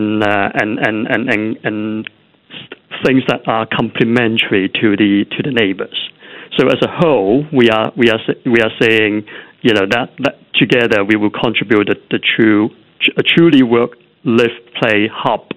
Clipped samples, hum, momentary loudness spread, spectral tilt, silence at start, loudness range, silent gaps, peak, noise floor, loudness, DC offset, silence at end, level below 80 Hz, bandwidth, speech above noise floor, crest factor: under 0.1%; none; 10 LU; -6.5 dB/octave; 0 s; 4 LU; none; 0 dBFS; -36 dBFS; -13 LUFS; under 0.1%; 0.05 s; -52 dBFS; 10 kHz; 23 dB; 14 dB